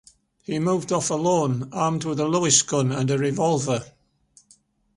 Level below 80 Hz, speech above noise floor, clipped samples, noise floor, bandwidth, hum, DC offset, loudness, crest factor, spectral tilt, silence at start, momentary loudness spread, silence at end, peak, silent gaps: -60 dBFS; 37 dB; under 0.1%; -59 dBFS; 11.5 kHz; none; under 0.1%; -22 LUFS; 20 dB; -4.5 dB/octave; 0.5 s; 9 LU; 1.05 s; -4 dBFS; none